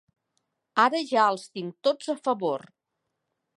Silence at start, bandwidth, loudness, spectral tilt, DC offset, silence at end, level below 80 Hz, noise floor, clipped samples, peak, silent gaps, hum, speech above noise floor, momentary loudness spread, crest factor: 0.75 s; 11.5 kHz; -26 LUFS; -4 dB/octave; under 0.1%; 1 s; -86 dBFS; -82 dBFS; under 0.1%; -6 dBFS; none; none; 56 dB; 10 LU; 22 dB